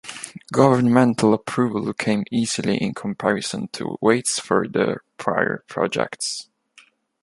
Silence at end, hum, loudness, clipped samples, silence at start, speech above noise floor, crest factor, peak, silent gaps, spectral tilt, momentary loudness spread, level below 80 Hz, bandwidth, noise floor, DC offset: 0.8 s; none; -21 LUFS; under 0.1%; 0.05 s; 34 dB; 20 dB; -2 dBFS; none; -5 dB/octave; 11 LU; -60 dBFS; 11.5 kHz; -54 dBFS; under 0.1%